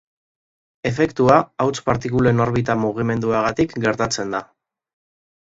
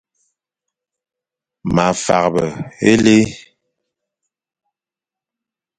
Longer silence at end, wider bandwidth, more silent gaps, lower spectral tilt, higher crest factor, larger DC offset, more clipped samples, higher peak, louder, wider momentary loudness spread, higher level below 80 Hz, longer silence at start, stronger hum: second, 1 s vs 2.4 s; second, 8 kHz vs 9.6 kHz; neither; about the same, -6 dB/octave vs -5 dB/octave; about the same, 20 dB vs 20 dB; neither; neither; about the same, 0 dBFS vs 0 dBFS; second, -19 LUFS vs -15 LUFS; about the same, 9 LU vs 11 LU; about the same, -46 dBFS vs -48 dBFS; second, 0.85 s vs 1.65 s; neither